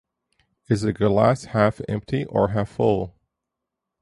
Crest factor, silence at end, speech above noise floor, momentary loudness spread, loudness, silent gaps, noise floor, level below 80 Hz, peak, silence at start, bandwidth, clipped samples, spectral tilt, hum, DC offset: 20 dB; 0.9 s; 62 dB; 7 LU; -22 LUFS; none; -83 dBFS; -48 dBFS; -4 dBFS; 0.7 s; 11.5 kHz; under 0.1%; -7.5 dB/octave; none; under 0.1%